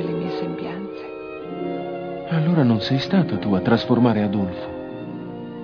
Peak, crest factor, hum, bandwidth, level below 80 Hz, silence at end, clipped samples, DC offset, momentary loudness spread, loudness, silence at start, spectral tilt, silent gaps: -4 dBFS; 18 dB; none; 5.4 kHz; -56 dBFS; 0 s; under 0.1%; under 0.1%; 15 LU; -22 LUFS; 0 s; -8.5 dB/octave; none